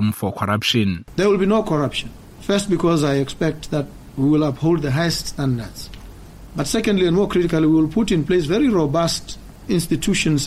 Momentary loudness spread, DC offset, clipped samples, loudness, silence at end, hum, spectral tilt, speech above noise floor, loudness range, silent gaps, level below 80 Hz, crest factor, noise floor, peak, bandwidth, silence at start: 10 LU; under 0.1%; under 0.1%; -19 LUFS; 0 s; none; -5.5 dB/octave; 20 dB; 3 LU; none; -40 dBFS; 14 dB; -38 dBFS; -4 dBFS; 15.5 kHz; 0 s